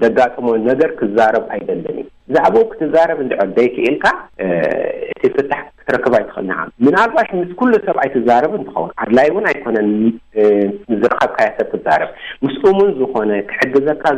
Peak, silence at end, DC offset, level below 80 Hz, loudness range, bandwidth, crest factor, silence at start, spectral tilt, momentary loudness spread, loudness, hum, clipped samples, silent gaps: -2 dBFS; 0 s; under 0.1%; -50 dBFS; 2 LU; 9.2 kHz; 12 dB; 0 s; -7 dB/octave; 9 LU; -15 LUFS; none; under 0.1%; none